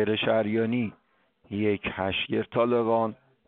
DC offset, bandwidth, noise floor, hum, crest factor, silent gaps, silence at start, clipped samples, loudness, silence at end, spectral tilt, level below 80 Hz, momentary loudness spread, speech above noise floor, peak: under 0.1%; 4.3 kHz; -64 dBFS; none; 16 dB; none; 0 s; under 0.1%; -27 LUFS; 0.35 s; -4 dB/octave; -60 dBFS; 7 LU; 39 dB; -12 dBFS